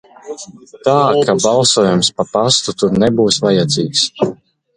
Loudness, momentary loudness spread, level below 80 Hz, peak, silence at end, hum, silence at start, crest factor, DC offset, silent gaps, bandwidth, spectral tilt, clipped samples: -13 LUFS; 17 LU; -48 dBFS; 0 dBFS; 0.4 s; none; 0.25 s; 14 dB; under 0.1%; none; 11 kHz; -4 dB/octave; under 0.1%